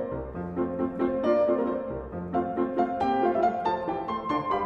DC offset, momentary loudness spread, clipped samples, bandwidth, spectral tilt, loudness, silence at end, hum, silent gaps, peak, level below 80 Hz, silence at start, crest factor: under 0.1%; 9 LU; under 0.1%; 7.2 kHz; -8.5 dB/octave; -28 LUFS; 0 s; none; none; -12 dBFS; -50 dBFS; 0 s; 16 dB